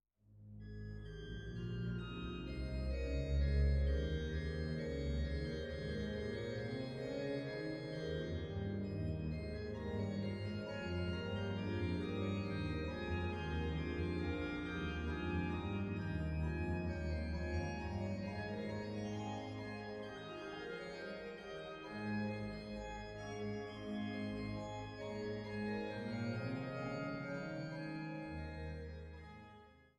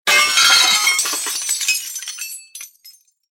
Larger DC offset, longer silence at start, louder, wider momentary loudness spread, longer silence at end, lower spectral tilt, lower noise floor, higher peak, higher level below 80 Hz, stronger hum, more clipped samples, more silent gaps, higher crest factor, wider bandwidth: neither; first, 0.3 s vs 0.05 s; second, -43 LUFS vs -13 LUFS; second, 8 LU vs 20 LU; second, 0.15 s vs 0.45 s; first, -7.5 dB/octave vs 3.5 dB/octave; first, -62 dBFS vs -48 dBFS; second, -24 dBFS vs 0 dBFS; first, -48 dBFS vs -68 dBFS; neither; neither; neither; about the same, 18 dB vs 18 dB; second, 9 kHz vs 17 kHz